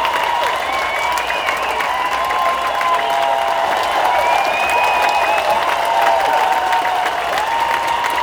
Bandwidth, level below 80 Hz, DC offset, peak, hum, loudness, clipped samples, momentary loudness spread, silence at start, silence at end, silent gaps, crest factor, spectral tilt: over 20 kHz; -48 dBFS; under 0.1%; 0 dBFS; none; -16 LUFS; under 0.1%; 4 LU; 0 s; 0 s; none; 16 dB; -1.5 dB/octave